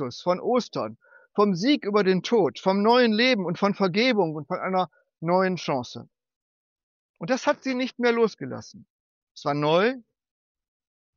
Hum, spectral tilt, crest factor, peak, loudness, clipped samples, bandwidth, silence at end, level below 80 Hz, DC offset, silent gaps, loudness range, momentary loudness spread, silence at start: none; -4 dB/octave; 18 dB; -8 dBFS; -24 LUFS; under 0.1%; 7.2 kHz; 1.15 s; -76 dBFS; under 0.1%; 6.36-6.76 s, 6.83-7.14 s, 8.90-9.35 s; 6 LU; 13 LU; 0 s